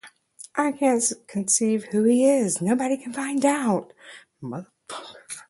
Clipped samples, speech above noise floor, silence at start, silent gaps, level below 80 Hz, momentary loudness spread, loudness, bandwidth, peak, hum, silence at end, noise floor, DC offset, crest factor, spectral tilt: under 0.1%; 25 dB; 0.05 s; none; -70 dBFS; 18 LU; -22 LUFS; 11.5 kHz; -6 dBFS; none; 0.1 s; -48 dBFS; under 0.1%; 18 dB; -4 dB/octave